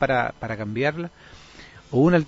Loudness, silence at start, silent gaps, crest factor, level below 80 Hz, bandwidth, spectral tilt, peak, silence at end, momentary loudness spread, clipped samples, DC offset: -24 LUFS; 0 s; none; 18 dB; -50 dBFS; 7.8 kHz; -8 dB/octave; -6 dBFS; 0 s; 24 LU; under 0.1%; under 0.1%